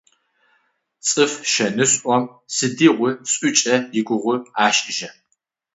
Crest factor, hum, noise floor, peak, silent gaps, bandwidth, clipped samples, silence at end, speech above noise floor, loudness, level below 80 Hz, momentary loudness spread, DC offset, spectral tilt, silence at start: 18 dB; none; -71 dBFS; -2 dBFS; none; 8 kHz; under 0.1%; 0.65 s; 52 dB; -18 LUFS; -70 dBFS; 8 LU; under 0.1%; -2.5 dB/octave; 1.05 s